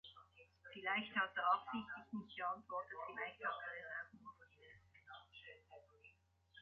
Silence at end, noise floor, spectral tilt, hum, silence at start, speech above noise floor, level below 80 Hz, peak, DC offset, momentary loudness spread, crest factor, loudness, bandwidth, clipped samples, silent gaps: 0 s; -73 dBFS; -1 dB/octave; none; 0.05 s; 29 dB; -82 dBFS; -26 dBFS; under 0.1%; 25 LU; 22 dB; -44 LUFS; 7 kHz; under 0.1%; none